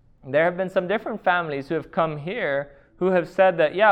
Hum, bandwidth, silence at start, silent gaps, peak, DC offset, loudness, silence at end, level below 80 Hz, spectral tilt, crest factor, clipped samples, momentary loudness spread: none; 8.4 kHz; 0.25 s; none; -6 dBFS; under 0.1%; -23 LUFS; 0 s; -58 dBFS; -7.5 dB/octave; 18 dB; under 0.1%; 8 LU